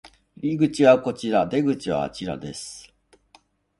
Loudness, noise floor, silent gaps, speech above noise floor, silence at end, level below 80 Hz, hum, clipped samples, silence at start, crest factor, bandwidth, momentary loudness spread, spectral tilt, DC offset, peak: -22 LUFS; -58 dBFS; none; 37 dB; 1 s; -56 dBFS; none; under 0.1%; 0.05 s; 20 dB; 11.5 kHz; 17 LU; -6 dB/octave; under 0.1%; -4 dBFS